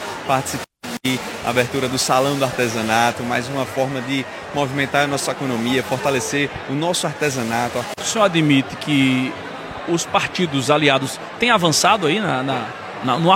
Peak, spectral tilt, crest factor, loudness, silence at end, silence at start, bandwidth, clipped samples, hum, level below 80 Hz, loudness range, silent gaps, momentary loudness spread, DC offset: -2 dBFS; -4 dB/octave; 18 dB; -19 LUFS; 0 s; 0 s; 16.5 kHz; under 0.1%; none; -54 dBFS; 3 LU; none; 9 LU; under 0.1%